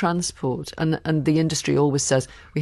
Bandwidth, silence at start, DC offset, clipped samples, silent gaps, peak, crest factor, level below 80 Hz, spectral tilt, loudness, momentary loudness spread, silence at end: 12.5 kHz; 0 s; under 0.1%; under 0.1%; none; -8 dBFS; 14 dB; -50 dBFS; -5 dB/octave; -22 LUFS; 7 LU; 0 s